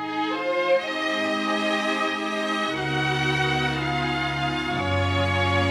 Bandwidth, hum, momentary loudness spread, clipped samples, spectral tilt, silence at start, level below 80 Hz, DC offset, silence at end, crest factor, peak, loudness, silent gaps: 13 kHz; none; 3 LU; under 0.1%; -5 dB/octave; 0 s; -48 dBFS; under 0.1%; 0 s; 14 dB; -10 dBFS; -24 LUFS; none